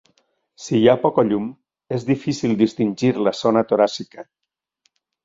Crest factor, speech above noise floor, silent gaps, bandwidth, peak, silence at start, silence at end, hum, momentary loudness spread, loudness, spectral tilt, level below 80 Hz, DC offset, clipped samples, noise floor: 18 dB; 50 dB; none; 7.8 kHz; -2 dBFS; 0.6 s; 1 s; none; 14 LU; -19 LUFS; -6.5 dB/octave; -60 dBFS; under 0.1%; under 0.1%; -68 dBFS